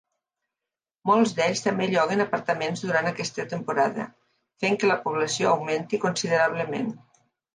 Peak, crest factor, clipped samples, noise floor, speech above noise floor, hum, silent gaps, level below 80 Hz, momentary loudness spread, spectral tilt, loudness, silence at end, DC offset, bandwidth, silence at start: -8 dBFS; 18 dB; under 0.1%; -89 dBFS; 65 dB; none; none; -72 dBFS; 8 LU; -4.5 dB/octave; -25 LUFS; 0.6 s; under 0.1%; 10 kHz; 1.05 s